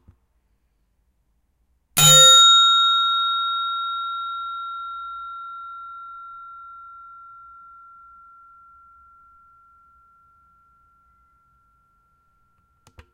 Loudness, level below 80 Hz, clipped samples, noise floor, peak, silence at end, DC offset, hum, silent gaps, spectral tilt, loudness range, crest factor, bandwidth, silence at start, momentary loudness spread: -14 LUFS; -58 dBFS; under 0.1%; -67 dBFS; -2 dBFS; 6.3 s; under 0.1%; none; none; -0.5 dB/octave; 23 LU; 20 dB; 16 kHz; 1.95 s; 29 LU